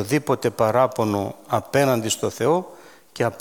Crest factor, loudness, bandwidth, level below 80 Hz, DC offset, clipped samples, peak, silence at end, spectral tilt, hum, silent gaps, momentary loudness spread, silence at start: 18 dB; -22 LUFS; 19 kHz; -60 dBFS; 0.1%; under 0.1%; -4 dBFS; 0 s; -5 dB/octave; none; none; 7 LU; 0 s